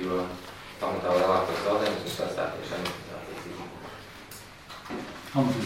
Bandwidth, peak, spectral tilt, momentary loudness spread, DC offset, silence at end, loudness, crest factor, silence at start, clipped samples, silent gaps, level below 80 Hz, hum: 16 kHz; -10 dBFS; -5.5 dB/octave; 18 LU; under 0.1%; 0 s; -30 LUFS; 20 dB; 0 s; under 0.1%; none; -58 dBFS; none